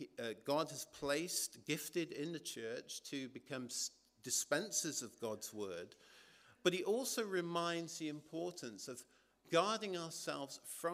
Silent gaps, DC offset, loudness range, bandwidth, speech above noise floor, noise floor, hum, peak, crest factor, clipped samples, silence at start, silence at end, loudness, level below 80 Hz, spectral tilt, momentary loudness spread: none; under 0.1%; 2 LU; 15.5 kHz; 24 dB; -65 dBFS; none; -20 dBFS; 24 dB; under 0.1%; 0 s; 0 s; -41 LUFS; -82 dBFS; -3 dB/octave; 11 LU